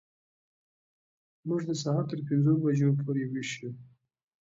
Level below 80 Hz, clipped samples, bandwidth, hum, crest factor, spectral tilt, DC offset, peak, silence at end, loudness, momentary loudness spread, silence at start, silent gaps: -74 dBFS; under 0.1%; 7.8 kHz; none; 16 dB; -7 dB/octave; under 0.1%; -14 dBFS; 0.55 s; -29 LUFS; 15 LU; 1.45 s; none